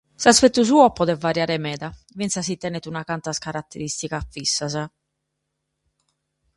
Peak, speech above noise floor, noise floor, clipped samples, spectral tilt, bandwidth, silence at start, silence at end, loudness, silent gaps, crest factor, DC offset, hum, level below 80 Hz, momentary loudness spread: 0 dBFS; 57 dB; -78 dBFS; under 0.1%; -3.5 dB/octave; 11.5 kHz; 0.2 s; 1.7 s; -21 LUFS; none; 22 dB; under 0.1%; none; -50 dBFS; 15 LU